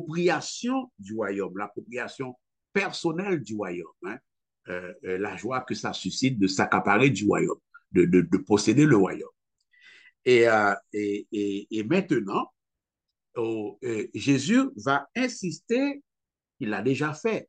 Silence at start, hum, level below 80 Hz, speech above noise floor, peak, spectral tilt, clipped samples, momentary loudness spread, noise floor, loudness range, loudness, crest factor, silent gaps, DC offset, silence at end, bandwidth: 0 s; none; -66 dBFS; 63 dB; -6 dBFS; -5.5 dB/octave; under 0.1%; 16 LU; -88 dBFS; 9 LU; -26 LUFS; 20 dB; none; under 0.1%; 0.05 s; 9.4 kHz